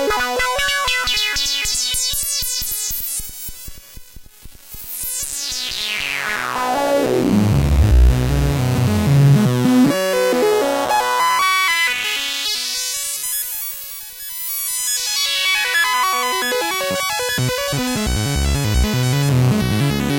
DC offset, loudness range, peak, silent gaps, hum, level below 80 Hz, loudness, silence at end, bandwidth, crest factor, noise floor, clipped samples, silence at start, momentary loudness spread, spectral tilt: under 0.1%; 7 LU; -4 dBFS; none; none; -26 dBFS; -17 LUFS; 0 s; 16.5 kHz; 14 dB; -39 dBFS; under 0.1%; 0 s; 8 LU; -4 dB/octave